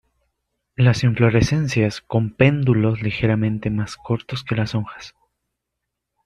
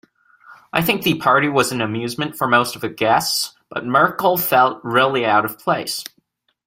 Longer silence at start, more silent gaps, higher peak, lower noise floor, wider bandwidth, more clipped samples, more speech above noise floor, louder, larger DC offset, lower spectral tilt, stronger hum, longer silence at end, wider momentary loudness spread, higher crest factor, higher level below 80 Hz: first, 0.8 s vs 0.5 s; neither; about the same, -2 dBFS vs -2 dBFS; first, -80 dBFS vs -65 dBFS; second, 10.5 kHz vs 16.5 kHz; neither; first, 61 dB vs 47 dB; about the same, -20 LUFS vs -18 LUFS; neither; first, -7 dB/octave vs -4 dB/octave; neither; first, 1.15 s vs 0.6 s; about the same, 10 LU vs 9 LU; about the same, 18 dB vs 18 dB; first, -44 dBFS vs -58 dBFS